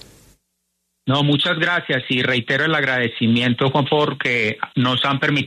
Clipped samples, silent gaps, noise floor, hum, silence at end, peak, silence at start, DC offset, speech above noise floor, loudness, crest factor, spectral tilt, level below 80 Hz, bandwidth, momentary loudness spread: under 0.1%; none; -73 dBFS; none; 0 s; -4 dBFS; 1.05 s; under 0.1%; 54 dB; -18 LUFS; 14 dB; -6 dB/octave; -58 dBFS; 11.5 kHz; 3 LU